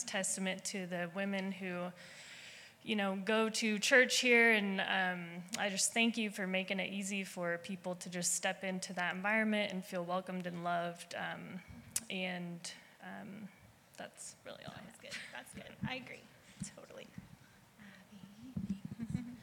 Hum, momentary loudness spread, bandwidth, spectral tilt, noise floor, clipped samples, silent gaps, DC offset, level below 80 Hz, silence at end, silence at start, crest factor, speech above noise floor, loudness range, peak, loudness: none; 20 LU; 18 kHz; -3 dB/octave; -61 dBFS; under 0.1%; none; under 0.1%; -72 dBFS; 0 s; 0 s; 24 dB; 24 dB; 17 LU; -14 dBFS; -35 LUFS